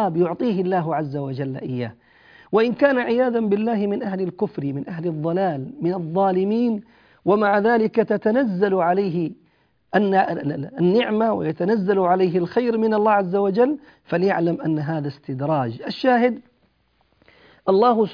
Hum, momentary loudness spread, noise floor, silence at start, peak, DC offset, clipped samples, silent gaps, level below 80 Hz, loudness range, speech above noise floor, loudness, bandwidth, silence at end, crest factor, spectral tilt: none; 10 LU; -64 dBFS; 0 s; -4 dBFS; under 0.1%; under 0.1%; none; -64 dBFS; 3 LU; 43 dB; -21 LUFS; 5.2 kHz; 0 s; 16 dB; -9.5 dB/octave